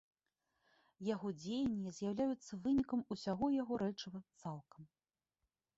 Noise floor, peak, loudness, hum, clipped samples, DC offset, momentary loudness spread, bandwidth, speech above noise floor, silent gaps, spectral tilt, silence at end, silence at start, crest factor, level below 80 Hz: under -90 dBFS; -26 dBFS; -41 LUFS; none; under 0.1%; under 0.1%; 12 LU; 7.8 kHz; over 50 dB; none; -6.5 dB/octave; 0.9 s; 1 s; 16 dB; -68 dBFS